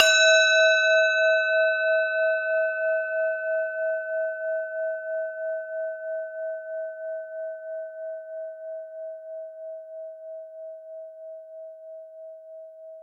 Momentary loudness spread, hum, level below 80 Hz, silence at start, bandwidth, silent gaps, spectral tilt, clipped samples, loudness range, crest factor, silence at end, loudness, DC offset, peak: 23 LU; none; -90 dBFS; 0 s; 14 kHz; none; 5 dB/octave; under 0.1%; 18 LU; 24 dB; 0 s; -24 LUFS; under 0.1%; -2 dBFS